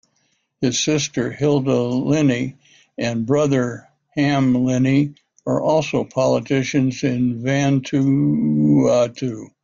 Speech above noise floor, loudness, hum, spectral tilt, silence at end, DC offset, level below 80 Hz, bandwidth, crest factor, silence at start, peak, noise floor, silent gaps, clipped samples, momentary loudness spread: 48 dB; -19 LUFS; none; -6 dB/octave; 0.15 s; under 0.1%; -54 dBFS; 7.6 kHz; 14 dB; 0.6 s; -4 dBFS; -66 dBFS; none; under 0.1%; 9 LU